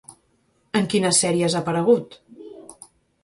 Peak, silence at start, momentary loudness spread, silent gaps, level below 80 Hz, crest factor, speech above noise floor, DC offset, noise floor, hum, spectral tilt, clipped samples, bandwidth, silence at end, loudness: -4 dBFS; 0.1 s; 24 LU; none; -62 dBFS; 20 dB; 44 dB; under 0.1%; -65 dBFS; none; -4 dB/octave; under 0.1%; 11.5 kHz; 0.5 s; -20 LUFS